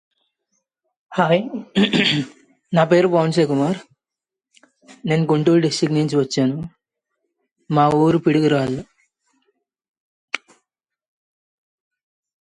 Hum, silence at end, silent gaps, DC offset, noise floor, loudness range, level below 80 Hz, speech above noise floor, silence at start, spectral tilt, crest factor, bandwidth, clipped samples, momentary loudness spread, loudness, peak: none; 2.05 s; 7.51-7.56 s, 9.88-9.94 s, 10.00-10.28 s; under 0.1%; -87 dBFS; 10 LU; -60 dBFS; 70 dB; 1.1 s; -6 dB/octave; 18 dB; 11 kHz; under 0.1%; 14 LU; -18 LUFS; -2 dBFS